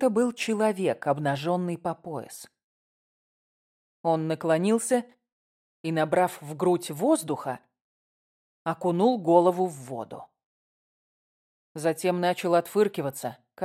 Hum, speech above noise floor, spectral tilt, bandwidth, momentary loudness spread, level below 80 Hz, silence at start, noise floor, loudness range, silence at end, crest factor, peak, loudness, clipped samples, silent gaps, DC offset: none; over 64 dB; -5.5 dB/octave; 16 kHz; 14 LU; -76 dBFS; 0 s; under -90 dBFS; 5 LU; 0 s; 22 dB; -6 dBFS; -26 LUFS; under 0.1%; 2.64-4.04 s, 5.32-5.84 s, 7.81-8.65 s, 10.45-11.75 s; under 0.1%